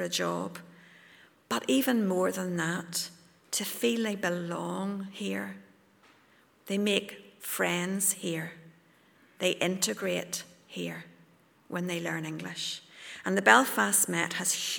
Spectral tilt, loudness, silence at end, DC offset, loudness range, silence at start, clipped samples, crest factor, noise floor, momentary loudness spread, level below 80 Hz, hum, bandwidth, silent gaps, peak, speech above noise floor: -3 dB/octave; -29 LUFS; 0 s; under 0.1%; 7 LU; 0 s; under 0.1%; 30 dB; -63 dBFS; 15 LU; -80 dBFS; none; over 20 kHz; none; -2 dBFS; 33 dB